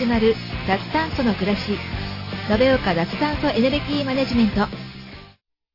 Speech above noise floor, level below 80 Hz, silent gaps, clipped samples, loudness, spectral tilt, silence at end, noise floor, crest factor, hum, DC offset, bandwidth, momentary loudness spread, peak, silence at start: 32 dB; -38 dBFS; none; under 0.1%; -21 LUFS; -7 dB/octave; 0.45 s; -52 dBFS; 16 dB; none; under 0.1%; 5.8 kHz; 11 LU; -6 dBFS; 0 s